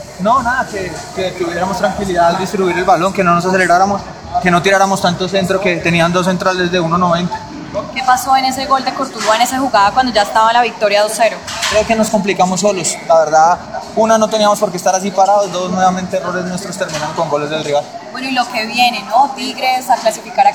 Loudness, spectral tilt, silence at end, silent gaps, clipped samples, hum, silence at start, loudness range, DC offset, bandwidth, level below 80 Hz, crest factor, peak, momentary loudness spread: -14 LUFS; -4 dB/octave; 0 s; none; under 0.1%; none; 0 s; 3 LU; 0.1%; over 20 kHz; -44 dBFS; 14 dB; 0 dBFS; 8 LU